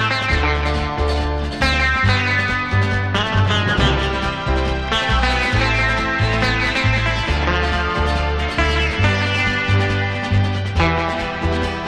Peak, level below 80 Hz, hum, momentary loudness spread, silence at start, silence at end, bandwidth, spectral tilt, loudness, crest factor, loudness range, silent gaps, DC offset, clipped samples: -4 dBFS; -24 dBFS; none; 4 LU; 0 s; 0 s; 10 kHz; -5.5 dB/octave; -18 LUFS; 14 dB; 1 LU; none; under 0.1%; under 0.1%